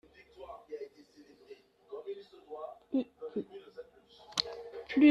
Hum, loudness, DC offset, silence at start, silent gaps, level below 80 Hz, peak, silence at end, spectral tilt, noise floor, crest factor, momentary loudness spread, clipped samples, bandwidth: none; -37 LUFS; under 0.1%; 0.4 s; none; -74 dBFS; -10 dBFS; 0 s; -3.5 dB/octave; -59 dBFS; 26 dB; 21 LU; under 0.1%; 11.5 kHz